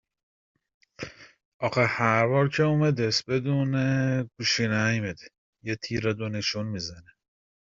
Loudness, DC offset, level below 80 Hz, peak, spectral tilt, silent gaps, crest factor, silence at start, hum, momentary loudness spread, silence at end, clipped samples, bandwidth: -26 LUFS; under 0.1%; -60 dBFS; -6 dBFS; -5.5 dB/octave; 1.45-1.60 s, 5.38-5.53 s; 20 dB; 1 s; none; 15 LU; 0.75 s; under 0.1%; 7.6 kHz